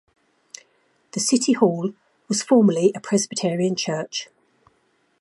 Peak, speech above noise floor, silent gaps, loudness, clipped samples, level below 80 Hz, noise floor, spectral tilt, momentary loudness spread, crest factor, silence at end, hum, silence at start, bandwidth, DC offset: -2 dBFS; 45 dB; none; -21 LUFS; under 0.1%; -72 dBFS; -65 dBFS; -4.5 dB/octave; 25 LU; 20 dB; 0.95 s; none; 1.15 s; 11.5 kHz; under 0.1%